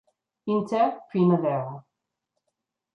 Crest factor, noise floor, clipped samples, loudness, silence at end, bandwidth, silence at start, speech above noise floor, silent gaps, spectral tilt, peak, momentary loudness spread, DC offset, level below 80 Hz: 18 dB; -83 dBFS; under 0.1%; -25 LUFS; 1.15 s; 7 kHz; 0.45 s; 59 dB; none; -9 dB/octave; -10 dBFS; 16 LU; under 0.1%; -74 dBFS